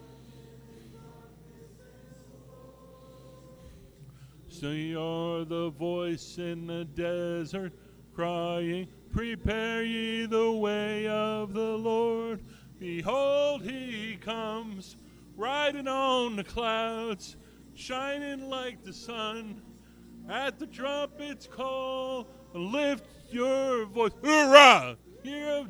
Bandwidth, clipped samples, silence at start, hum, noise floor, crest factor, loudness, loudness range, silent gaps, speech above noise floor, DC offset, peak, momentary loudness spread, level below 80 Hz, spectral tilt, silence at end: over 20 kHz; under 0.1%; 0 s; none; -52 dBFS; 30 dB; -28 LUFS; 10 LU; none; 24 dB; under 0.1%; -2 dBFS; 13 LU; -54 dBFS; -4 dB/octave; 0 s